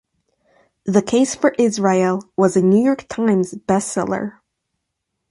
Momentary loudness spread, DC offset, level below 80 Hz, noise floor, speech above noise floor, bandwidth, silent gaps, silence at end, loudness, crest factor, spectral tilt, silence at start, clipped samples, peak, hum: 7 LU; under 0.1%; -58 dBFS; -77 dBFS; 60 dB; 11.5 kHz; none; 1 s; -18 LUFS; 16 dB; -6 dB/octave; 0.85 s; under 0.1%; -2 dBFS; none